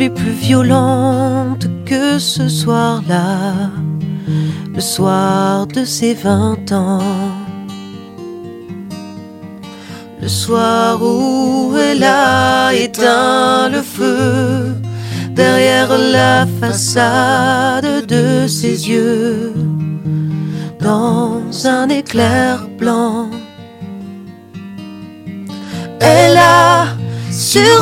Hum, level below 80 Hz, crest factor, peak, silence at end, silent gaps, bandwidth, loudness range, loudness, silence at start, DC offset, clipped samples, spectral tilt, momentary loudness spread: none; -52 dBFS; 14 dB; 0 dBFS; 0 s; none; 16.5 kHz; 7 LU; -13 LUFS; 0 s; under 0.1%; under 0.1%; -5 dB/octave; 19 LU